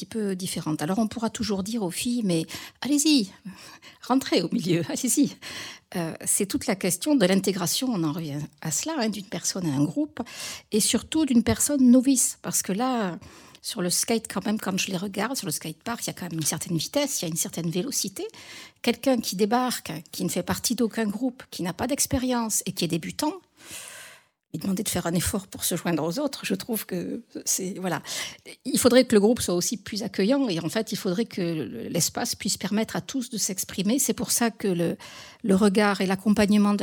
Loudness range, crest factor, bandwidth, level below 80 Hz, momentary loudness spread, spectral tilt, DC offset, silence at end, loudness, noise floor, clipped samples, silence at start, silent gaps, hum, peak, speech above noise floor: 5 LU; 20 dB; 19.5 kHz; -56 dBFS; 13 LU; -4 dB/octave; under 0.1%; 0 s; -25 LUFS; -52 dBFS; under 0.1%; 0 s; none; none; -6 dBFS; 26 dB